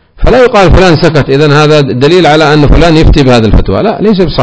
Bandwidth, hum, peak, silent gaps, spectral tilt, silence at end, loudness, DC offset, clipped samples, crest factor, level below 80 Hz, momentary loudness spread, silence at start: 8 kHz; none; 0 dBFS; none; -6.5 dB/octave; 0 s; -5 LUFS; under 0.1%; 20%; 4 dB; -14 dBFS; 4 LU; 0.2 s